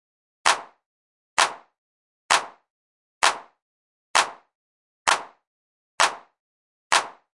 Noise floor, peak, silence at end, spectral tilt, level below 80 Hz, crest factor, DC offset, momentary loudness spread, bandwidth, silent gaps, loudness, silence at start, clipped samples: under -90 dBFS; -2 dBFS; 0.25 s; 1.5 dB/octave; -72 dBFS; 24 dB; under 0.1%; 6 LU; 11.5 kHz; 0.86-1.37 s, 1.78-2.29 s, 2.70-3.21 s, 3.62-4.14 s, 4.55-5.05 s, 5.47-5.98 s, 6.40-6.90 s; -23 LUFS; 0.45 s; under 0.1%